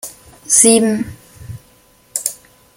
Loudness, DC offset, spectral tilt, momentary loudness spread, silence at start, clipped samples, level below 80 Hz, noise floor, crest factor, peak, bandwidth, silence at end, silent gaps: -13 LUFS; under 0.1%; -3 dB/octave; 26 LU; 0.05 s; under 0.1%; -50 dBFS; -50 dBFS; 18 dB; 0 dBFS; over 20 kHz; 0.45 s; none